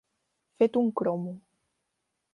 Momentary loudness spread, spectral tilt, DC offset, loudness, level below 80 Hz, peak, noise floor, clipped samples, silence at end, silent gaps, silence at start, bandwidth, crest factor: 15 LU; -9 dB/octave; under 0.1%; -27 LUFS; -76 dBFS; -12 dBFS; -81 dBFS; under 0.1%; 0.95 s; none; 0.6 s; 5.8 kHz; 18 dB